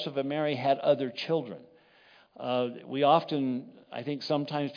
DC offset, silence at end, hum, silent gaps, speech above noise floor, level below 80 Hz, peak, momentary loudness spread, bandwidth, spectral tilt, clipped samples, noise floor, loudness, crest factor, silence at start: under 0.1%; 0 s; none; none; 31 dB; -86 dBFS; -10 dBFS; 15 LU; 5.2 kHz; -7 dB/octave; under 0.1%; -60 dBFS; -29 LUFS; 20 dB; 0 s